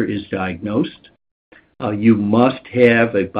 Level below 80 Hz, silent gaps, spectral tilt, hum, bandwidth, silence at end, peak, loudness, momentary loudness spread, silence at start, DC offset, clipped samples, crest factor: -54 dBFS; 1.31-1.52 s; -9 dB/octave; none; 5 kHz; 0 s; 0 dBFS; -17 LUFS; 11 LU; 0 s; under 0.1%; under 0.1%; 18 dB